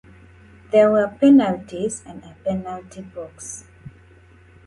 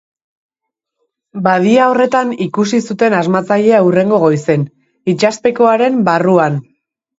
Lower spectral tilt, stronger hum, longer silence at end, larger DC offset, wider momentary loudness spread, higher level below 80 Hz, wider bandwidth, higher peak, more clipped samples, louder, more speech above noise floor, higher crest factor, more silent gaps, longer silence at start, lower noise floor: about the same, -6 dB/octave vs -6.5 dB/octave; neither; first, 1.05 s vs 0.6 s; neither; first, 22 LU vs 8 LU; about the same, -54 dBFS vs -58 dBFS; first, 11.5 kHz vs 8 kHz; second, -4 dBFS vs 0 dBFS; neither; second, -18 LUFS vs -12 LUFS; second, 30 dB vs 67 dB; about the same, 18 dB vs 14 dB; neither; second, 0.75 s vs 1.35 s; second, -49 dBFS vs -79 dBFS